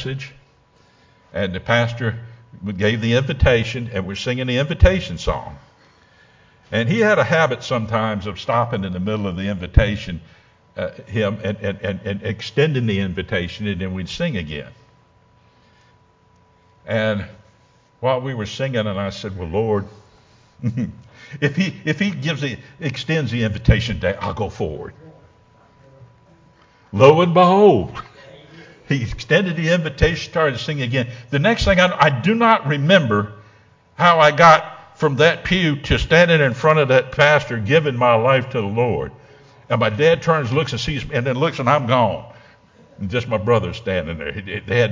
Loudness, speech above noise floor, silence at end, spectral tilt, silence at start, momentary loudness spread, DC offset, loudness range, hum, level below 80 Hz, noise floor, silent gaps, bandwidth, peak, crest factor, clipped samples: -18 LUFS; 37 dB; 0 s; -6 dB/octave; 0 s; 14 LU; under 0.1%; 9 LU; none; -34 dBFS; -55 dBFS; none; 7.6 kHz; 0 dBFS; 20 dB; under 0.1%